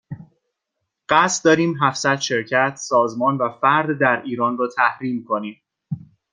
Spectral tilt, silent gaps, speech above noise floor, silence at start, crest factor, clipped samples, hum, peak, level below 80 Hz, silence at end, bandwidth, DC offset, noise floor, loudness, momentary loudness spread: -4 dB/octave; none; 60 dB; 0.1 s; 20 dB; under 0.1%; none; 0 dBFS; -64 dBFS; 0.35 s; 9.8 kHz; under 0.1%; -79 dBFS; -19 LUFS; 16 LU